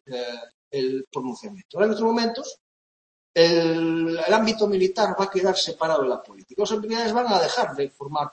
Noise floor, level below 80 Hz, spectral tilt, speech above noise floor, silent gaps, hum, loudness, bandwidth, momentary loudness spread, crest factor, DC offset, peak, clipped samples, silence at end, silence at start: under -90 dBFS; -66 dBFS; -4.5 dB/octave; over 67 dB; 0.54-0.71 s, 1.07-1.11 s, 1.65-1.69 s, 2.60-3.34 s; none; -23 LUFS; 8.6 kHz; 14 LU; 20 dB; under 0.1%; -2 dBFS; under 0.1%; 0 s; 0.1 s